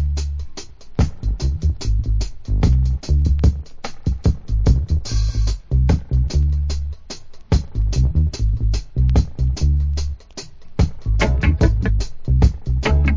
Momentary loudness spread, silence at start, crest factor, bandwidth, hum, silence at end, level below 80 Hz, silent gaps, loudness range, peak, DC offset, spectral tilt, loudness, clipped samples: 12 LU; 0 s; 16 dB; 7.6 kHz; none; 0 s; -20 dBFS; none; 1 LU; -2 dBFS; under 0.1%; -6.5 dB/octave; -20 LUFS; under 0.1%